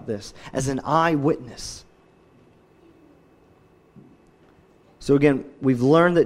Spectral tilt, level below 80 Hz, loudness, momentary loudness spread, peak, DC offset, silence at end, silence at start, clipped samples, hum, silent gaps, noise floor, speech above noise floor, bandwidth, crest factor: -6.5 dB/octave; -52 dBFS; -22 LUFS; 18 LU; -4 dBFS; under 0.1%; 0 s; 0.05 s; under 0.1%; none; none; -56 dBFS; 35 dB; 13 kHz; 20 dB